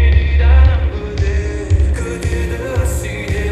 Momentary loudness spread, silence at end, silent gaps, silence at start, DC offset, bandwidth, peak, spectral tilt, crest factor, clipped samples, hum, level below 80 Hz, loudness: 9 LU; 0 s; none; 0 s; under 0.1%; 13 kHz; 0 dBFS; -6.5 dB/octave; 14 dB; under 0.1%; none; -14 dBFS; -16 LUFS